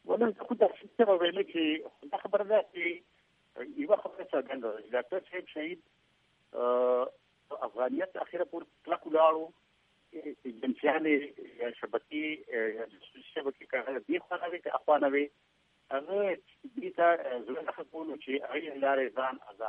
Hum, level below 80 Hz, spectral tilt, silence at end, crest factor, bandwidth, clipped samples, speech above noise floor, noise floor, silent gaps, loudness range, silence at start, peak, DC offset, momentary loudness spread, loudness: none; -82 dBFS; -7 dB/octave; 0 s; 22 dB; 4.2 kHz; under 0.1%; 39 dB; -71 dBFS; none; 4 LU; 0.05 s; -12 dBFS; under 0.1%; 15 LU; -32 LUFS